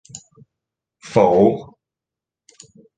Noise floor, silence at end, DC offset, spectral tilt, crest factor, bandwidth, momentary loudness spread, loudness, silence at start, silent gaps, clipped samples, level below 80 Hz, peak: -87 dBFS; 1.35 s; under 0.1%; -7 dB/octave; 20 dB; 9.4 kHz; 26 LU; -16 LUFS; 0.15 s; none; under 0.1%; -56 dBFS; 0 dBFS